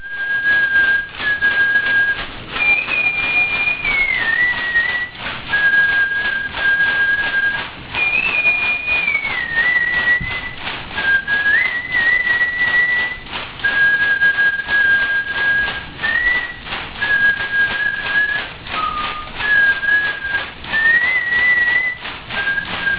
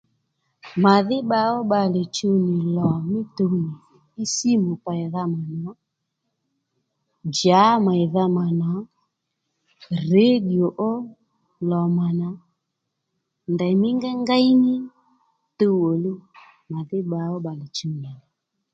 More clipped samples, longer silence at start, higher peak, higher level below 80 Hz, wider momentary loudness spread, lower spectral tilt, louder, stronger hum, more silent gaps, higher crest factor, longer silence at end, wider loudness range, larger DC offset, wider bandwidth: neither; second, 0 s vs 0.65 s; second, -6 dBFS vs -2 dBFS; first, -42 dBFS vs -64 dBFS; second, 9 LU vs 15 LU; about the same, -5.5 dB/octave vs -6 dB/octave; first, -15 LUFS vs -21 LUFS; neither; neither; second, 12 dB vs 20 dB; second, 0 s vs 0.55 s; second, 2 LU vs 5 LU; neither; second, 4 kHz vs 7.8 kHz